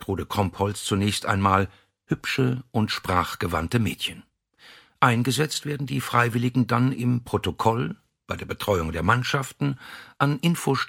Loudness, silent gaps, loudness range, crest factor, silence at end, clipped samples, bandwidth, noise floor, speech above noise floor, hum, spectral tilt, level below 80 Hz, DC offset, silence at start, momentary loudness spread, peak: -24 LUFS; none; 2 LU; 22 dB; 0 s; under 0.1%; 17 kHz; -53 dBFS; 29 dB; none; -5.5 dB/octave; -48 dBFS; under 0.1%; 0 s; 9 LU; -4 dBFS